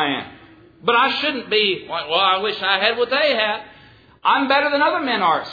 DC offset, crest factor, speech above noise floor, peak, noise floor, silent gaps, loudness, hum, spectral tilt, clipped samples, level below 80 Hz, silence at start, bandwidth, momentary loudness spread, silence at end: under 0.1%; 20 dB; 29 dB; 0 dBFS; -48 dBFS; none; -18 LUFS; none; -5 dB/octave; under 0.1%; -62 dBFS; 0 s; 5 kHz; 8 LU; 0 s